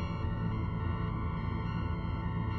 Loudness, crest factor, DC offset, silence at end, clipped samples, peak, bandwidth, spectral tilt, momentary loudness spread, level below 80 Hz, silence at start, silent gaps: -35 LUFS; 12 dB; under 0.1%; 0 s; under 0.1%; -22 dBFS; 6 kHz; -9.5 dB/octave; 1 LU; -40 dBFS; 0 s; none